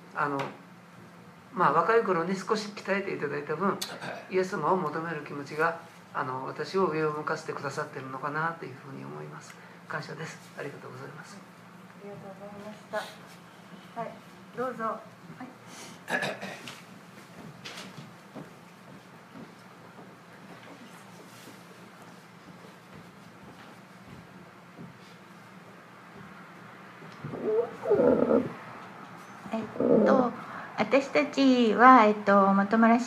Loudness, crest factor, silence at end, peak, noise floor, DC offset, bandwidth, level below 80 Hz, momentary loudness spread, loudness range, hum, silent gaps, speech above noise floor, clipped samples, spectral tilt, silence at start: -27 LUFS; 26 dB; 0 s; -4 dBFS; -50 dBFS; under 0.1%; 15 kHz; -74 dBFS; 26 LU; 22 LU; none; none; 23 dB; under 0.1%; -6 dB/octave; 0 s